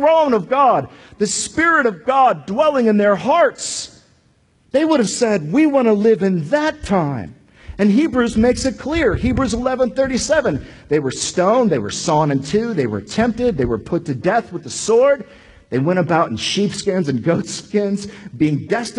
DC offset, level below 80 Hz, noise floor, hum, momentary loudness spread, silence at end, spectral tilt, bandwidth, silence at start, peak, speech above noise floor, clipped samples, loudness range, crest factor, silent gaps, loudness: under 0.1%; -40 dBFS; -57 dBFS; none; 8 LU; 0 s; -5 dB/octave; 11 kHz; 0 s; -2 dBFS; 40 dB; under 0.1%; 3 LU; 14 dB; none; -17 LUFS